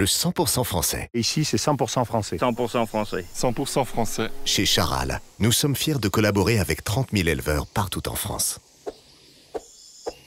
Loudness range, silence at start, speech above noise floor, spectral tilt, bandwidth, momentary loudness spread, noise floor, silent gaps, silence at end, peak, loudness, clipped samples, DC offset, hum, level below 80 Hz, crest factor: 4 LU; 0 s; 29 dB; -4 dB/octave; 16.5 kHz; 12 LU; -52 dBFS; none; 0.15 s; -8 dBFS; -23 LUFS; under 0.1%; under 0.1%; none; -40 dBFS; 16 dB